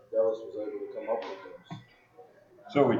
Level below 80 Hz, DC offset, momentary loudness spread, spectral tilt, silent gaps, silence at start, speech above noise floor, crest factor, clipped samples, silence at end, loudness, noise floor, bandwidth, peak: -78 dBFS; under 0.1%; 18 LU; -8 dB/octave; none; 0.1 s; 26 dB; 22 dB; under 0.1%; 0 s; -32 LUFS; -56 dBFS; 7.2 kHz; -10 dBFS